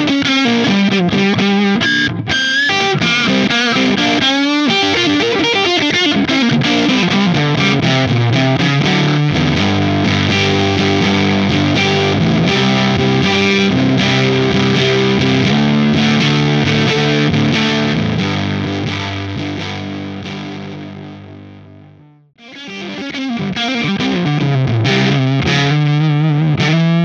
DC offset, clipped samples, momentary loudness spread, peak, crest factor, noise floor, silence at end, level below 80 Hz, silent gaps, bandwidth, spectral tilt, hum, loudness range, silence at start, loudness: under 0.1%; under 0.1%; 9 LU; 0 dBFS; 14 dB; -43 dBFS; 0 s; -42 dBFS; none; 8 kHz; -5.5 dB/octave; none; 10 LU; 0 s; -13 LUFS